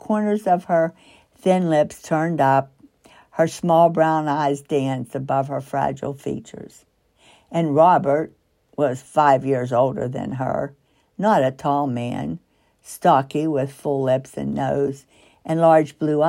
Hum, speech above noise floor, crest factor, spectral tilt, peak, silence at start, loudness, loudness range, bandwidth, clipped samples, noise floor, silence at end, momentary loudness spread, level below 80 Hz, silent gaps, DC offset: none; 36 dB; 18 dB; -7 dB/octave; -4 dBFS; 0.05 s; -20 LUFS; 3 LU; 15.5 kHz; under 0.1%; -55 dBFS; 0 s; 14 LU; -58 dBFS; none; under 0.1%